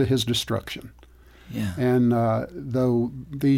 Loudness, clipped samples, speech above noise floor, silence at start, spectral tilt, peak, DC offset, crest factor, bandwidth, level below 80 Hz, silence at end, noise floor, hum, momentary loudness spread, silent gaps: -24 LUFS; under 0.1%; 26 dB; 0 s; -6.5 dB/octave; -12 dBFS; under 0.1%; 12 dB; 16.5 kHz; -50 dBFS; 0 s; -49 dBFS; none; 12 LU; none